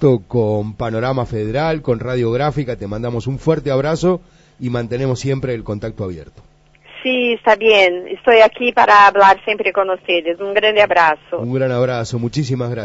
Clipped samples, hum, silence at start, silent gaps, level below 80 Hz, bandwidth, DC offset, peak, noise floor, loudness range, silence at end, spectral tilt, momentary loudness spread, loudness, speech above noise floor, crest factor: under 0.1%; none; 0 s; none; -44 dBFS; 8 kHz; under 0.1%; 0 dBFS; -41 dBFS; 8 LU; 0 s; -6 dB/octave; 13 LU; -15 LUFS; 26 dB; 16 dB